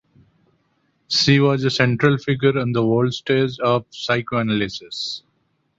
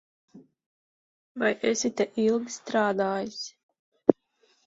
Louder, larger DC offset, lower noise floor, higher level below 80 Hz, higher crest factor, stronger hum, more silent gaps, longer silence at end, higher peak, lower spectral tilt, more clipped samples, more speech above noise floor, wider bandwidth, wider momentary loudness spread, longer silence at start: first, -19 LUFS vs -27 LUFS; neither; about the same, -67 dBFS vs -68 dBFS; first, -56 dBFS vs -70 dBFS; second, 20 dB vs 28 dB; neither; second, none vs 0.66-1.35 s, 3.63-3.69 s, 3.79-3.92 s; about the same, 0.6 s vs 0.55 s; about the same, -2 dBFS vs 0 dBFS; first, -5.5 dB/octave vs -4 dB/octave; neither; first, 48 dB vs 41 dB; about the same, 7.8 kHz vs 7.8 kHz; about the same, 11 LU vs 13 LU; first, 1.1 s vs 0.35 s